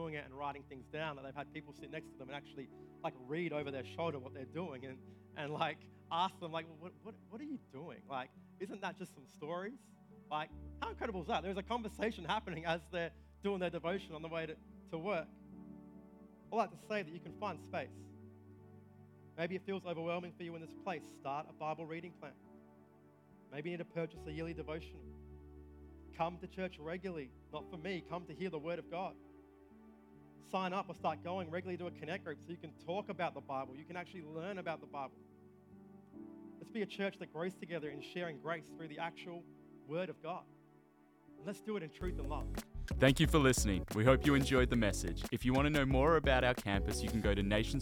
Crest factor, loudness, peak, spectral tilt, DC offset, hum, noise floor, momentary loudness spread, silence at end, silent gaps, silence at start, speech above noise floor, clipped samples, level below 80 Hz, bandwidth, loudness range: 24 dB; -40 LUFS; -16 dBFS; -5.5 dB/octave; under 0.1%; none; -67 dBFS; 22 LU; 0 s; none; 0 s; 27 dB; under 0.1%; -50 dBFS; 18 kHz; 14 LU